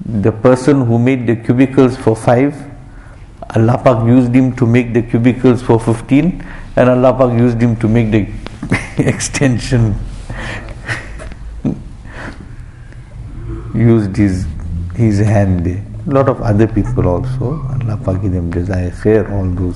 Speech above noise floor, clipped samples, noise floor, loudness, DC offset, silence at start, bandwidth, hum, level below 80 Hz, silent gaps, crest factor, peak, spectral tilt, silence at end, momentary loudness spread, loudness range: 22 dB; under 0.1%; -34 dBFS; -13 LUFS; under 0.1%; 0 s; 11.5 kHz; none; -28 dBFS; none; 14 dB; 0 dBFS; -7.5 dB/octave; 0 s; 18 LU; 7 LU